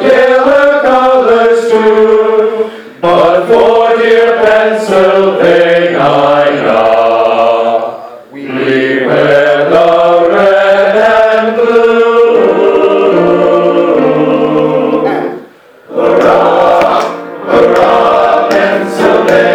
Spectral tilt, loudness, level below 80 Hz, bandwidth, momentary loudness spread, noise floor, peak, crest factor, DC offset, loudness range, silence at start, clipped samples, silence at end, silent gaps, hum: -5.5 dB/octave; -7 LUFS; -46 dBFS; 11.5 kHz; 6 LU; -35 dBFS; 0 dBFS; 8 dB; under 0.1%; 3 LU; 0 s; 2%; 0 s; none; none